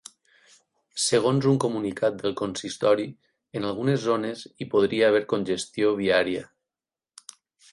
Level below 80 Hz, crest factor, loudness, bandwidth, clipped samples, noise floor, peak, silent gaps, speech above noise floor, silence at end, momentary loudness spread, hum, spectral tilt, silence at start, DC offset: -64 dBFS; 18 dB; -25 LUFS; 11.5 kHz; under 0.1%; under -90 dBFS; -8 dBFS; none; over 66 dB; 1.25 s; 15 LU; none; -5 dB/octave; 0.95 s; under 0.1%